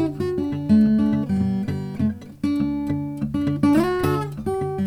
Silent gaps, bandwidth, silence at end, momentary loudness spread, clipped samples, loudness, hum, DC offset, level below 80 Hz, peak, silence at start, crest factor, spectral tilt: none; 15.5 kHz; 0 s; 8 LU; under 0.1%; -22 LUFS; none; under 0.1%; -46 dBFS; -6 dBFS; 0 s; 16 dB; -8 dB/octave